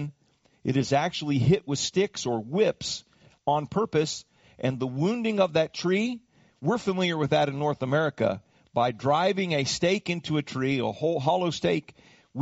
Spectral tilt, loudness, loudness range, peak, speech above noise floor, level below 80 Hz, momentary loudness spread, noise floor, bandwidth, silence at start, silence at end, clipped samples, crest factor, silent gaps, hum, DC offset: -5 dB/octave; -27 LUFS; 2 LU; -10 dBFS; 40 dB; -60 dBFS; 8 LU; -66 dBFS; 8 kHz; 0 s; 0 s; under 0.1%; 18 dB; none; none; under 0.1%